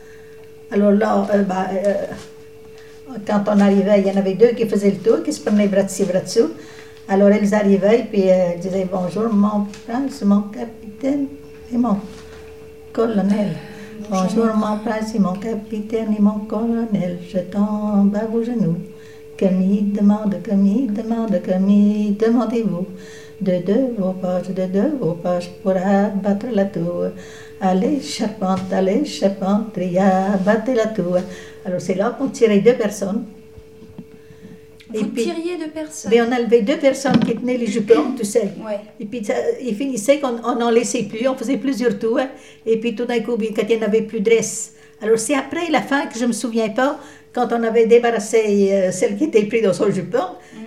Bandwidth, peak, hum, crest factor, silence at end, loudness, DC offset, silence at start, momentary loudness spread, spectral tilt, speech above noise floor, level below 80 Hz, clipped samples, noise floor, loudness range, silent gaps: 13.5 kHz; 0 dBFS; none; 18 dB; 0 s; -19 LUFS; 0.5%; 0 s; 12 LU; -6 dB/octave; 23 dB; -56 dBFS; under 0.1%; -41 dBFS; 4 LU; none